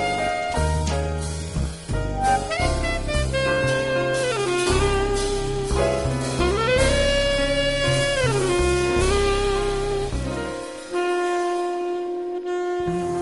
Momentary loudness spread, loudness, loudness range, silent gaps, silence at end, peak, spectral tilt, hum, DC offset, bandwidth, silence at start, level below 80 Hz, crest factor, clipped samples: 8 LU; -23 LUFS; 4 LU; none; 0 s; -6 dBFS; -4.5 dB/octave; none; 0.2%; 11.5 kHz; 0 s; -30 dBFS; 16 dB; under 0.1%